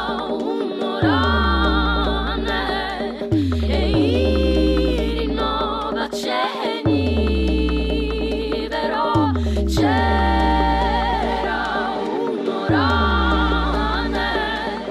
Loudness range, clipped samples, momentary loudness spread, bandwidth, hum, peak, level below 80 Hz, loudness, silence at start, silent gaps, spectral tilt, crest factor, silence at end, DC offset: 2 LU; under 0.1%; 6 LU; 13 kHz; none; -6 dBFS; -26 dBFS; -20 LUFS; 0 s; none; -6.5 dB/octave; 12 dB; 0 s; under 0.1%